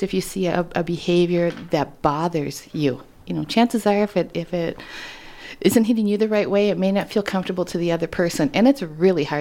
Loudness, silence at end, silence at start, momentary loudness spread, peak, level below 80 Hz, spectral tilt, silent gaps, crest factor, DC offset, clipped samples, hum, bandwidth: -21 LUFS; 0 s; 0 s; 10 LU; -4 dBFS; -50 dBFS; -6 dB/octave; none; 18 dB; under 0.1%; under 0.1%; none; 17 kHz